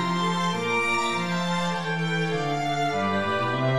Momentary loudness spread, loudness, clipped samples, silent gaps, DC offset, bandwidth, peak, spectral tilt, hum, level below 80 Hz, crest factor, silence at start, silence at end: 3 LU; -25 LUFS; under 0.1%; none; 0.7%; 13 kHz; -12 dBFS; -5 dB/octave; none; -64 dBFS; 12 dB; 0 s; 0 s